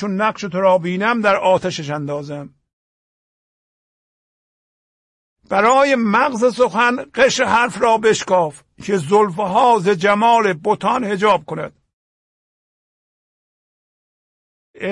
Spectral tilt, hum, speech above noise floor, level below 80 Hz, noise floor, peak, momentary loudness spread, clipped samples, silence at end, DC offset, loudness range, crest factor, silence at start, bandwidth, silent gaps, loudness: -4.5 dB/octave; none; over 74 dB; -58 dBFS; under -90 dBFS; -2 dBFS; 11 LU; under 0.1%; 0 s; under 0.1%; 11 LU; 16 dB; 0 s; 11.5 kHz; 2.73-5.36 s, 11.93-14.74 s; -16 LUFS